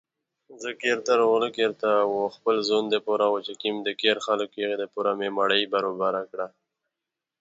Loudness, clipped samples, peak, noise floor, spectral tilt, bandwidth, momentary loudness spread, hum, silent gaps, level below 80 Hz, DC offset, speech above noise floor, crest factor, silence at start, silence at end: -25 LUFS; under 0.1%; -8 dBFS; -87 dBFS; -3.5 dB/octave; 7.8 kHz; 8 LU; none; none; -78 dBFS; under 0.1%; 62 dB; 18 dB; 0.5 s; 0.95 s